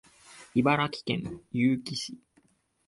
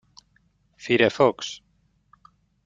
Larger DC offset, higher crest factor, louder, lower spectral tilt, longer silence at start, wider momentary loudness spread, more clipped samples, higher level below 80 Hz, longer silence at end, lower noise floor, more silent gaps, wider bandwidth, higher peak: neither; about the same, 20 dB vs 24 dB; second, -29 LUFS vs -22 LUFS; about the same, -5.5 dB/octave vs -4.5 dB/octave; second, 0.3 s vs 0.85 s; second, 11 LU vs 22 LU; neither; about the same, -62 dBFS vs -64 dBFS; second, 0.7 s vs 1.1 s; about the same, -67 dBFS vs -65 dBFS; neither; first, 11.5 kHz vs 7.8 kHz; second, -10 dBFS vs -4 dBFS